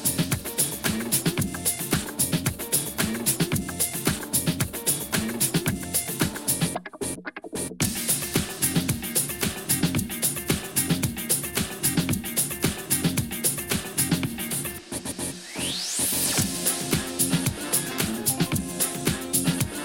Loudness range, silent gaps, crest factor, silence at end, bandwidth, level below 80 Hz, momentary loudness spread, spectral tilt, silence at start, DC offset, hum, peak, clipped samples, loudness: 2 LU; none; 20 dB; 0 s; 17 kHz; -48 dBFS; 5 LU; -3 dB/octave; 0 s; under 0.1%; none; -6 dBFS; under 0.1%; -25 LUFS